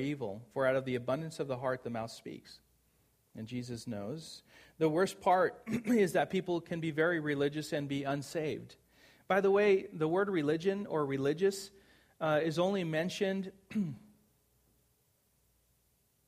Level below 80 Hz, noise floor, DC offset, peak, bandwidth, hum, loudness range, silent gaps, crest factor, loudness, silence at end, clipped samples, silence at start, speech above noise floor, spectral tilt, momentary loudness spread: -72 dBFS; -74 dBFS; under 0.1%; -16 dBFS; 15.5 kHz; none; 8 LU; none; 18 dB; -33 LUFS; 2.3 s; under 0.1%; 0 s; 41 dB; -6 dB/octave; 14 LU